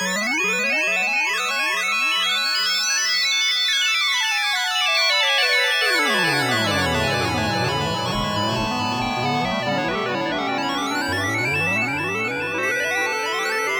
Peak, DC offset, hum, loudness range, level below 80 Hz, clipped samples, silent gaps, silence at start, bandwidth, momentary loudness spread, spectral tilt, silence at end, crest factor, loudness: -6 dBFS; under 0.1%; none; 5 LU; -48 dBFS; under 0.1%; none; 0 s; 18 kHz; 6 LU; -2.5 dB/octave; 0 s; 14 dB; -19 LUFS